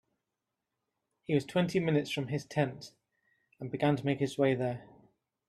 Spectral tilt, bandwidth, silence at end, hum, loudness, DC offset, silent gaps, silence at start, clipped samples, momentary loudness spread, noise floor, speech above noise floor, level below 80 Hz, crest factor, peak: -6.5 dB/octave; 13.5 kHz; 0.65 s; none; -32 LUFS; under 0.1%; none; 1.3 s; under 0.1%; 16 LU; -87 dBFS; 56 dB; -70 dBFS; 20 dB; -14 dBFS